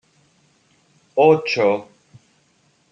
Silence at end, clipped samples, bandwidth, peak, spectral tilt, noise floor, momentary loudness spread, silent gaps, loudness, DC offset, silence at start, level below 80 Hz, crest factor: 1.1 s; under 0.1%; 7.4 kHz; -2 dBFS; -6 dB/octave; -61 dBFS; 11 LU; none; -18 LUFS; under 0.1%; 1.15 s; -70 dBFS; 20 dB